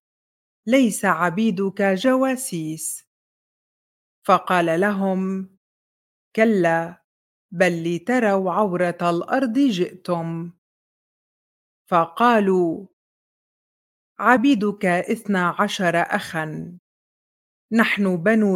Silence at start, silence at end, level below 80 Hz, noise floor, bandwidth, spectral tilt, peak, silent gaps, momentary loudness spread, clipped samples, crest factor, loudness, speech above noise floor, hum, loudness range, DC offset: 0.65 s; 0 s; -70 dBFS; under -90 dBFS; 16.5 kHz; -5.5 dB/octave; 0 dBFS; 3.07-4.22 s, 5.57-6.31 s, 7.04-7.49 s, 10.58-11.85 s, 12.93-14.15 s, 16.79-17.69 s; 12 LU; under 0.1%; 20 dB; -20 LUFS; over 70 dB; none; 3 LU; under 0.1%